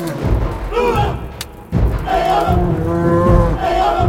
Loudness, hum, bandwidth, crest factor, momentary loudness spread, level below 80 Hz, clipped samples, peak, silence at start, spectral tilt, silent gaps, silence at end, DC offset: -16 LUFS; none; 16.5 kHz; 16 dB; 8 LU; -22 dBFS; under 0.1%; 0 dBFS; 0 s; -7 dB/octave; none; 0 s; under 0.1%